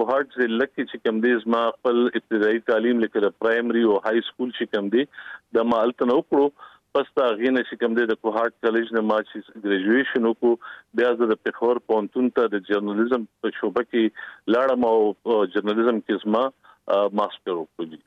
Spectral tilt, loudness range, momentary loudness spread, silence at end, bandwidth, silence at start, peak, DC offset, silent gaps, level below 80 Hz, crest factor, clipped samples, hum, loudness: -7 dB/octave; 1 LU; 6 LU; 0.1 s; 5.8 kHz; 0 s; -8 dBFS; under 0.1%; none; -70 dBFS; 14 dB; under 0.1%; none; -23 LUFS